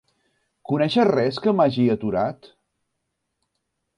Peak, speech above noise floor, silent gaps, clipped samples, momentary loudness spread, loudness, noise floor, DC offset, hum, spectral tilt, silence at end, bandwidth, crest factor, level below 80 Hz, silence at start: -6 dBFS; 57 dB; none; under 0.1%; 7 LU; -21 LUFS; -78 dBFS; under 0.1%; none; -7.5 dB/octave; 1.65 s; 10.5 kHz; 18 dB; -60 dBFS; 0.7 s